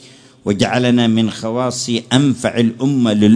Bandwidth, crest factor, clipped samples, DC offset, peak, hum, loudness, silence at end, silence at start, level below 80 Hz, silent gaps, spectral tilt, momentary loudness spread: 10.5 kHz; 14 dB; under 0.1%; under 0.1%; 0 dBFS; none; -16 LUFS; 0 s; 0.45 s; -52 dBFS; none; -5.5 dB/octave; 6 LU